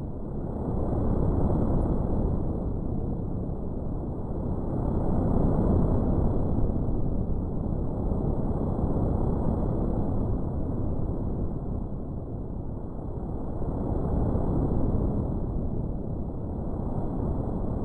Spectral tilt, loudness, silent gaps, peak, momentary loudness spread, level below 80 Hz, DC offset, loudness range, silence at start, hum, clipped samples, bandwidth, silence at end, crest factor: -12.5 dB/octave; -30 LUFS; none; -12 dBFS; 8 LU; -32 dBFS; under 0.1%; 5 LU; 0 s; none; under 0.1%; 2 kHz; 0 s; 16 dB